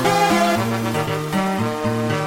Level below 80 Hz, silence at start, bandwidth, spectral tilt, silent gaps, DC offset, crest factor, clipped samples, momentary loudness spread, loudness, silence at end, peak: -50 dBFS; 0 s; 17 kHz; -5 dB/octave; none; under 0.1%; 14 dB; under 0.1%; 6 LU; -20 LUFS; 0 s; -4 dBFS